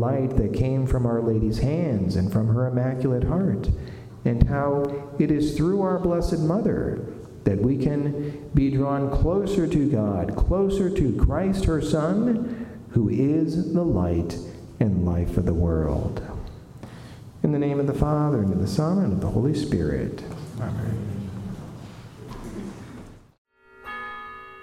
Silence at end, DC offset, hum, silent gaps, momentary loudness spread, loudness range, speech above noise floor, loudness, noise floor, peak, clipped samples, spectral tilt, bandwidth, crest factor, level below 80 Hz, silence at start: 0 s; under 0.1%; none; 23.38-23.45 s; 15 LU; 6 LU; 21 dB; -24 LUFS; -43 dBFS; -4 dBFS; under 0.1%; -8.5 dB/octave; 14.5 kHz; 20 dB; -34 dBFS; 0 s